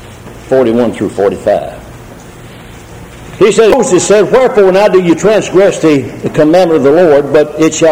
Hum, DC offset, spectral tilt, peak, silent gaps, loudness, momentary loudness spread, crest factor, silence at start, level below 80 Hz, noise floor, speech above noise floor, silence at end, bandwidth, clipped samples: none; under 0.1%; -5 dB/octave; 0 dBFS; none; -8 LUFS; 7 LU; 8 dB; 0 s; -38 dBFS; -30 dBFS; 23 dB; 0 s; 16.5 kHz; 0.8%